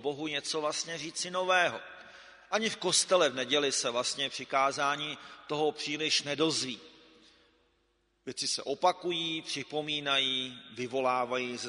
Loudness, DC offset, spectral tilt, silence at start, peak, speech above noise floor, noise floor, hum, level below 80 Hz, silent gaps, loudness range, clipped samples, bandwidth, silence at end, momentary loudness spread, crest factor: -30 LUFS; under 0.1%; -2 dB/octave; 0 s; -12 dBFS; 42 dB; -74 dBFS; none; -76 dBFS; none; 4 LU; under 0.1%; 10.5 kHz; 0 s; 11 LU; 20 dB